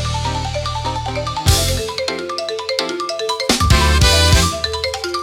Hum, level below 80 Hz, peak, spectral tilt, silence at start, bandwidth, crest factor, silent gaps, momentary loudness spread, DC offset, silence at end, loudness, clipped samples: none; -22 dBFS; 0 dBFS; -3.5 dB/octave; 0 s; 17 kHz; 16 dB; none; 10 LU; under 0.1%; 0 s; -17 LUFS; under 0.1%